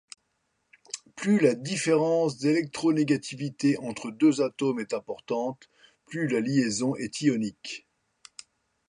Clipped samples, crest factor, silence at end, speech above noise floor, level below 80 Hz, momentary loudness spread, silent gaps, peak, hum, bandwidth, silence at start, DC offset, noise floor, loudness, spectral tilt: under 0.1%; 18 dB; 1.1 s; 50 dB; -72 dBFS; 16 LU; none; -10 dBFS; none; 11 kHz; 0.95 s; under 0.1%; -76 dBFS; -27 LUFS; -5.5 dB/octave